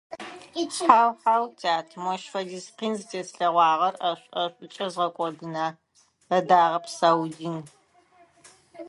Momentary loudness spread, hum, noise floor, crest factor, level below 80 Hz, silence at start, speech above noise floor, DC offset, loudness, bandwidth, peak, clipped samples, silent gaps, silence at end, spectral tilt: 15 LU; none; -59 dBFS; 24 dB; -74 dBFS; 0.1 s; 34 dB; under 0.1%; -25 LUFS; 11.5 kHz; 0 dBFS; under 0.1%; none; 0 s; -4 dB/octave